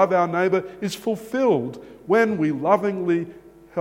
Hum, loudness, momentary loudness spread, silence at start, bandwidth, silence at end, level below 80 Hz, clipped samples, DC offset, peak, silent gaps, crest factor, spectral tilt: none; -22 LUFS; 12 LU; 0 s; 16.5 kHz; 0 s; -62 dBFS; under 0.1%; under 0.1%; -4 dBFS; none; 18 dB; -6.5 dB/octave